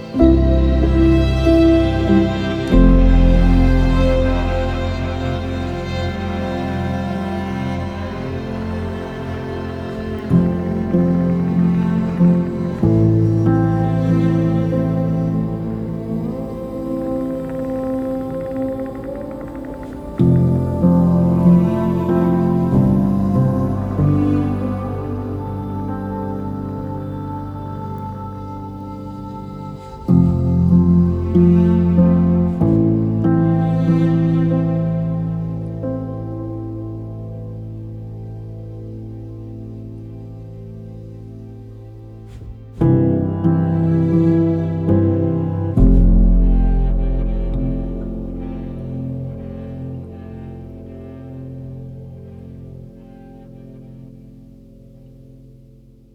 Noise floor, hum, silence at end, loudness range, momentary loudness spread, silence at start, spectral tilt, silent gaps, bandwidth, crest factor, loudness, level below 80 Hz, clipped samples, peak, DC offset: -45 dBFS; none; 0.65 s; 17 LU; 19 LU; 0 s; -9.5 dB/octave; none; 6.6 kHz; 16 dB; -18 LUFS; -24 dBFS; under 0.1%; 0 dBFS; under 0.1%